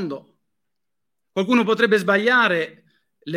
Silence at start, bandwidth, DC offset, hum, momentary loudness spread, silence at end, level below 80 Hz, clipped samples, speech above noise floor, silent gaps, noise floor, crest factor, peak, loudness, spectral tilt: 0 s; 15.5 kHz; under 0.1%; none; 15 LU; 0 s; -74 dBFS; under 0.1%; 66 dB; none; -84 dBFS; 20 dB; -2 dBFS; -18 LUFS; -5.5 dB/octave